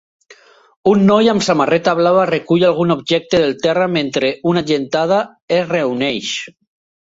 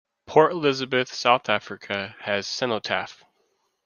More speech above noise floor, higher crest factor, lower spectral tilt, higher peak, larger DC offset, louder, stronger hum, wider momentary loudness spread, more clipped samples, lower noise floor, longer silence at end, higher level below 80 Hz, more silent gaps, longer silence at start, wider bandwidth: second, 32 dB vs 47 dB; second, 14 dB vs 22 dB; first, -5.5 dB/octave vs -4 dB/octave; about the same, -2 dBFS vs -4 dBFS; neither; first, -15 LUFS vs -24 LUFS; neither; second, 6 LU vs 10 LU; neither; second, -46 dBFS vs -70 dBFS; second, 0.55 s vs 0.7 s; first, -54 dBFS vs -70 dBFS; first, 5.42-5.48 s vs none; first, 0.85 s vs 0.3 s; first, 8 kHz vs 7.2 kHz